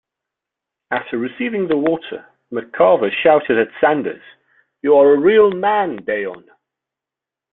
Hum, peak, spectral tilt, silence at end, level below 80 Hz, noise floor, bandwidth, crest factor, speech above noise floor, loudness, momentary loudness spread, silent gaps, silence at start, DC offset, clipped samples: none; 0 dBFS; -10 dB/octave; 1.15 s; -60 dBFS; -87 dBFS; 4 kHz; 16 dB; 71 dB; -16 LUFS; 16 LU; none; 0.9 s; under 0.1%; under 0.1%